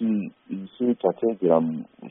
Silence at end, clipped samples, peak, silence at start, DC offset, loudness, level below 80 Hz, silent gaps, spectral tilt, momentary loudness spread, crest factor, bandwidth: 0 s; under 0.1%; -6 dBFS; 0 s; under 0.1%; -24 LUFS; -72 dBFS; none; -7 dB/octave; 14 LU; 18 dB; 3.8 kHz